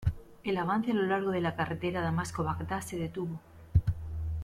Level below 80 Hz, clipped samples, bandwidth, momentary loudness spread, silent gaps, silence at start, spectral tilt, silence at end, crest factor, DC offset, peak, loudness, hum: -44 dBFS; under 0.1%; 15 kHz; 8 LU; none; 0 s; -6.5 dB/octave; 0 s; 20 dB; under 0.1%; -12 dBFS; -32 LUFS; none